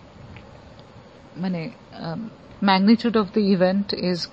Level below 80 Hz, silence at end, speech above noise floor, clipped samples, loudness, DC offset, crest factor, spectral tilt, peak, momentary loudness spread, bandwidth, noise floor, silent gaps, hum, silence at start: -56 dBFS; 0 s; 24 dB; under 0.1%; -21 LUFS; under 0.1%; 20 dB; -7 dB/octave; -4 dBFS; 21 LU; 7.8 kHz; -46 dBFS; none; none; 0.2 s